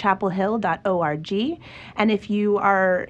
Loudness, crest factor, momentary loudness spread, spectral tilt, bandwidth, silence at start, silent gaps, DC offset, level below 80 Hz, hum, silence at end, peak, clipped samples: -22 LUFS; 16 dB; 8 LU; -7 dB/octave; 8 kHz; 0 s; none; under 0.1%; -56 dBFS; none; 0.05 s; -6 dBFS; under 0.1%